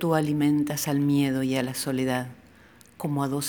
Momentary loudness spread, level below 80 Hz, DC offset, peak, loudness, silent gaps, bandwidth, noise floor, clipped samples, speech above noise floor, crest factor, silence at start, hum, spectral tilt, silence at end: 8 LU; -62 dBFS; under 0.1%; -8 dBFS; -26 LUFS; none; over 20 kHz; -54 dBFS; under 0.1%; 29 dB; 18 dB; 0 s; none; -5.5 dB/octave; 0 s